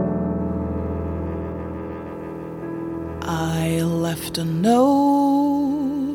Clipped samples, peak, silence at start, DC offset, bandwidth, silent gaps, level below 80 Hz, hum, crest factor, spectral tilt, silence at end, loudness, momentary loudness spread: under 0.1%; -6 dBFS; 0 s; under 0.1%; 17.5 kHz; none; -40 dBFS; none; 16 dB; -6.5 dB/octave; 0 s; -22 LUFS; 15 LU